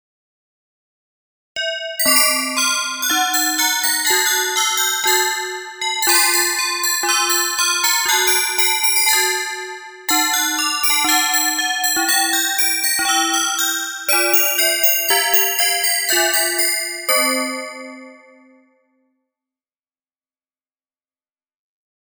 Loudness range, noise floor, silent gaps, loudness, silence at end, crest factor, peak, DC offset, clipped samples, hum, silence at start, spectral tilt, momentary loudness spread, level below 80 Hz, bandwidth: 4 LU; under -90 dBFS; none; -15 LUFS; 3.9 s; 18 dB; 0 dBFS; under 0.1%; under 0.1%; none; 1.55 s; 2.5 dB/octave; 9 LU; -66 dBFS; over 20 kHz